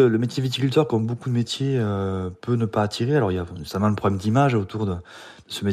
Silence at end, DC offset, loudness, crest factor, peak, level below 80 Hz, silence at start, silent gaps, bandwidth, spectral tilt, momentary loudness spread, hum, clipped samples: 0 s; under 0.1%; -23 LUFS; 16 dB; -6 dBFS; -54 dBFS; 0 s; none; 14.5 kHz; -7 dB/octave; 9 LU; none; under 0.1%